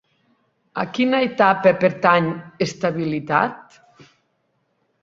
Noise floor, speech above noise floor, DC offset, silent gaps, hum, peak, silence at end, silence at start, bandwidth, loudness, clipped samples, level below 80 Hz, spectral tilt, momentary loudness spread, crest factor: -69 dBFS; 50 dB; under 0.1%; none; none; -2 dBFS; 1.4 s; 0.75 s; 7.8 kHz; -19 LUFS; under 0.1%; -62 dBFS; -6 dB/octave; 10 LU; 20 dB